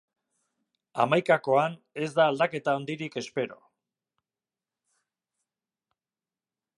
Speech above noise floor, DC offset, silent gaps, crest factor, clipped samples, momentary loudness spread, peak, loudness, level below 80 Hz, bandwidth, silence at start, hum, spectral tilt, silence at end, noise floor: over 64 dB; under 0.1%; none; 22 dB; under 0.1%; 11 LU; -8 dBFS; -27 LUFS; -80 dBFS; 11.5 kHz; 0.95 s; none; -5.5 dB/octave; 3.25 s; under -90 dBFS